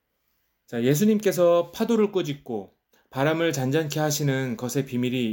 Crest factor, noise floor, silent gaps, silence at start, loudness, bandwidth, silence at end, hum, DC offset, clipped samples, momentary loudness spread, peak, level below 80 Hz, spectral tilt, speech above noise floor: 16 dB; -73 dBFS; none; 0.7 s; -24 LUFS; 17 kHz; 0 s; none; under 0.1%; under 0.1%; 12 LU; -8 dBFS; -66 dBFS; -5.5 dB/octave; 49 dB